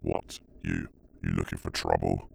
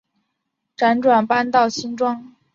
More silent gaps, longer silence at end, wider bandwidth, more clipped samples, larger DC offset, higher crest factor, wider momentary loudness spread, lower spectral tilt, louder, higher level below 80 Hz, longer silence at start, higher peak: neither; second, 0 s vs 0.25 s; first, over 20 kHz vs 7.6 kHz; neither; neither; first, 22 dB vs 16 dB; first, 11 LU vs 7 LU; first, -6 dB/octave vs -4.5 dB/octave; second, -32 LUFS vs -18 LUFS; first, -44 dBFS vs -64 dBFS; second, 0 s vs 0.8 s; second, -10 dBFS vs -4 dBFS